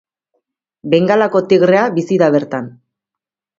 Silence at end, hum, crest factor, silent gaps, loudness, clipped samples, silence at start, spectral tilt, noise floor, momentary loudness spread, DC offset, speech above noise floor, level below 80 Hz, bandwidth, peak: 0.9 s; none; 16 dB; none; -13 LUFS; under 0.1%; 0.85 s; -7 dB/octave; -85 dBFS; 13 LU; under 0.1%; 72 dB; -60 dBFS; 7.6 kHz; 0 dBFS